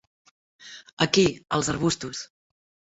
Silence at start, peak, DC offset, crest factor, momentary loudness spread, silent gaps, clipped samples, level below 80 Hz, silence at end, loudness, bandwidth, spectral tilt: 0.6 s; -4 dBFS; under 0.1%; 24 dB; 23 LU; 0.93-0.97 s; under 0.1%; -56 dBFS; 0.7 s; -24 LUFS; 8.2 kHz; -4 dB/octave